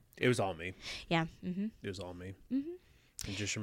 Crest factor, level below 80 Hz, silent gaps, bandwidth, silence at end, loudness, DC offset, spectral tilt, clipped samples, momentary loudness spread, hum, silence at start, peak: 22 dB; -60 dBFS; none; 16.5 kHz; 0 s; -38 LUFS; under 0.1%; -4.5 dB/octave; under 0.1%; 14 LU; none; 0.15 s; -16 dBFS